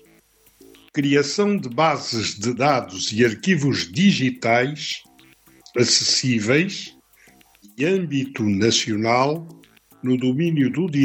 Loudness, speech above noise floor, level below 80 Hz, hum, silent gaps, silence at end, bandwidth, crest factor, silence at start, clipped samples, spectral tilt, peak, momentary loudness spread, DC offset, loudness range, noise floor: -20 LUFS; 36 dB; -64 dBFS; none; none; 0 s; 16 kHz; 18 dB; 0.95 s; under 0.1%; -4.5 dB/octave; -4 dBFS; 9 LU; under 0.1%; 2 LU; -56 dBFS